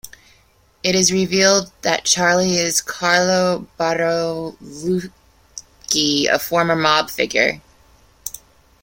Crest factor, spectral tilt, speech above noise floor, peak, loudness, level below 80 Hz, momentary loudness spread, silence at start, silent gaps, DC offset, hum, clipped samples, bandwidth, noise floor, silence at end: 20 dB; -2.5 dB/octave; 37 dB; 0 dBFS; -17 LUFS; -54 dBFS; 17 LU; 0.05 s; none; under 0.1%; none; under 0.1%; 16.5 kHz; -55 dBFS; 0.45 s